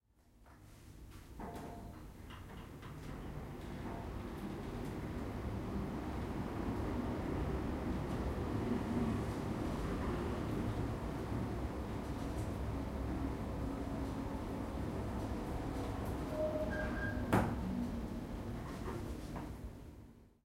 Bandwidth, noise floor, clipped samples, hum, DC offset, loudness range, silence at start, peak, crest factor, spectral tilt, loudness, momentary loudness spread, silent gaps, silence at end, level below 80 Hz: 16 kHz; -65 dBFS; under 0.1%; none; under 0.1%; 8 LU; 0.35 s; -16 dBFS; 24 dB; -7 dB/octave; -41 LUFS; 13 LU; none; 0.15 s; -48 dBFS